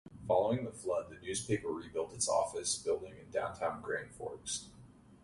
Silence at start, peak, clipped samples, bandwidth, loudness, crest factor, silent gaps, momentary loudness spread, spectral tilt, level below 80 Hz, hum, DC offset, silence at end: 0.05 s; -18 dBFS; under 0.1%; 11.5 kHz; -36 LUFS; 20 dB; none; 8 LU; -3.5 dB/octave; -64 dBFS; none; under 0.1%; 0.1 s